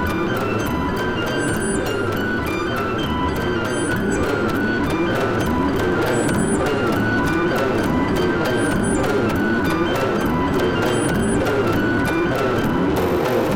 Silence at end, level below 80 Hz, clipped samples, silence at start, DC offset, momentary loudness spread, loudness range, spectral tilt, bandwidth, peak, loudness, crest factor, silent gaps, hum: 0 s; -36 dBFS; under 0.1%; 0 s; under 0.1%; 3 LU; 2 LU; -5.5 dB/octave; 17 kHz; -10 dBFS; -20 LUFS; 10 dB; none; none